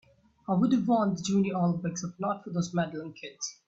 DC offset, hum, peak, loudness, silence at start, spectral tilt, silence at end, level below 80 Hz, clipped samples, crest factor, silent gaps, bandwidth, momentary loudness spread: under 0.1%; none; -14 dBFS; -29 LUFS; 0.5 s; -6 dB/octave; 0.15 s; -66 dBFS; under 0.1%; 16 dB; none; 8 kHz; 12 LU